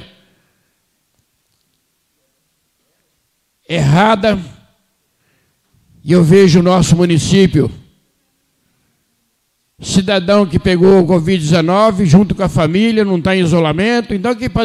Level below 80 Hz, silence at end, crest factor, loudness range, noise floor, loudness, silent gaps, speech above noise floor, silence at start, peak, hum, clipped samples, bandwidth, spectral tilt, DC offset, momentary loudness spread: -38 dBFS; 0 s; 14 dB; 6 LU; -64 dBFS; -12 LUFS; none; 53 dB; 0 s; 0 dBFS; none; under 0.1%; 12 kHz; -6.5 dB/octave; under 0.1%; 8 LU